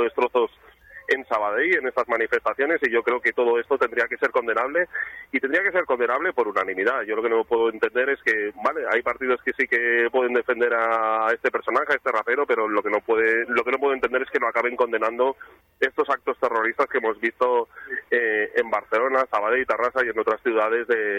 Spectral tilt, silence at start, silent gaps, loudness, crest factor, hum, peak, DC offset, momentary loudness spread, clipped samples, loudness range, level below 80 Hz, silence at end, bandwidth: -4.5 dB/octave; 0 s; none; -22 LUFS; 16 dB; none; -6 dBFS; under 0.1%; 4 LU; under 0.1%; 2 LU; -64 dBFS; 0 s; 8.4 kHz